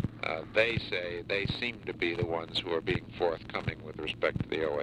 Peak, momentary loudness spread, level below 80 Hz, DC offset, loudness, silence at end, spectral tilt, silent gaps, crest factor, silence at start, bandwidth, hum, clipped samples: -12 dBFS; 7 LU; -52 dBFS; under 0.1%; -32 LUFS; 0 s; -6 dB/octave; none; 20 dB; 0 s; 11.5 kHz; none; under 0.1%